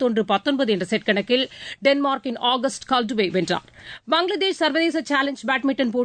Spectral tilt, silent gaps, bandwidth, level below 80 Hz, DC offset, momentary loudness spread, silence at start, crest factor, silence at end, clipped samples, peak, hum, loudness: -4 dB/octave; none; 9.4 kHz; -62 dBFS; under 0.1%; 4 LU; 0 s; 16 dB; 0 s; under 0.1%; -6 dBFS; none; -22 LUFS